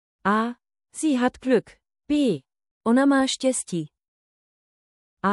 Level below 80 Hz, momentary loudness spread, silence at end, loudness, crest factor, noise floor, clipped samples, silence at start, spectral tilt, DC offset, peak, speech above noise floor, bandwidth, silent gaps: -62 dBFS; 12 LU; 0 s; -23 LUFS; 16 dB; under -90 dBFS; under 0.1%; 0.25 s; -4.5 dB/octave; under 0.1%; -8 dBFS; over 68 dB; 12 kHz; 2.71-2.81 s, 4.08-5.17 s